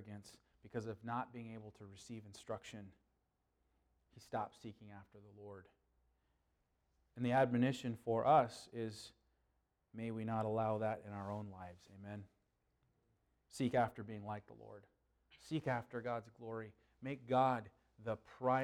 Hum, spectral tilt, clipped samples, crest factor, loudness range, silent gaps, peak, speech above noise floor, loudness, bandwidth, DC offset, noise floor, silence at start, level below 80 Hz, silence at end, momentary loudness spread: none; -6.5 dB/octave; under 0.1%; 22 dB; 15 LU; none; -20 dBFS; 43 dB; -40 LUFS; 13.5 kHz; under 0.1%; -83 dBFS; 0 s; -76 dBFS; 0 s; 22 LU